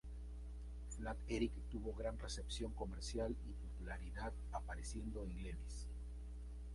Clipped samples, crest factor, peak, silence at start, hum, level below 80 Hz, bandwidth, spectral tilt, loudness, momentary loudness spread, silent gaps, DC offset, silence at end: under 0.1%; 18 dB; -28 dBFS; 0.05 s; 60 Hz at -50 dBFS; -48 dBFS; 11.5 kHz; -5.5 dB/octave; -48 LUFS; 9 LU; none; under 0.1%; 0 s